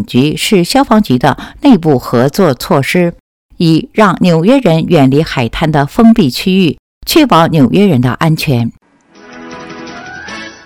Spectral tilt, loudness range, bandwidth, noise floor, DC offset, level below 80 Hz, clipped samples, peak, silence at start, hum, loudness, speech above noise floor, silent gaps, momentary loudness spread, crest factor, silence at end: -6 dB/octave; 2 LU; 18 kHz; -41 dBFS; under 0.1%; -36 dBFS; 1%; 0 dBFS; 0 s; none; -10 LUFS; 33 dB; 3.20-3.49 s, 6.79-7.01 s; 17 LU; 10 dB; 0.15 s